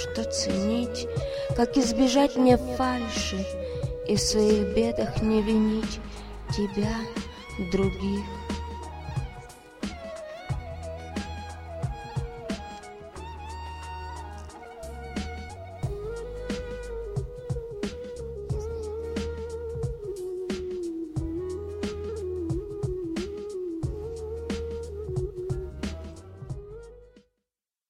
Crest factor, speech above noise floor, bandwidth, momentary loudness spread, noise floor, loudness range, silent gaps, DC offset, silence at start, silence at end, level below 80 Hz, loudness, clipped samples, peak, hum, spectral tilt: 24 dB; 63 dB; 15.5 kHz; 16 LU; -87 dBFS; 12 LU; none; under 0.1%; 0 s; 0.7 s; -42 dBFS; -30 LUFS; under 0.1%; -6 dBFS; none; -5.5 dB/octave